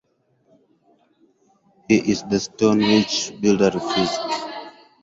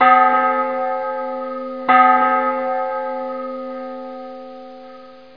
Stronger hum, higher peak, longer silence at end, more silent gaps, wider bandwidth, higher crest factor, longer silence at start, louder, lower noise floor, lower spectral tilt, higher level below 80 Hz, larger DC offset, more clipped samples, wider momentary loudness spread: neither; second, -4 dBFS vs 0 dBFS; first, 0.35 s vs 0.15 s; neither; first, 8 kHz vs 5.2 kHz; about the same, 18 dB vs 18 dB; first, 1.9 s vs 0 s; about the same, -20 LUFS vs -18 LUFS; first, -64 dBFS vs -40 dBFS; second, -4.5 dB/octave vs -6 dB/octave; first, -56 dBFS vs -68 dBFS; second, under 0.1% vs 0.4%; neither; second, 10 LU vs 22 LU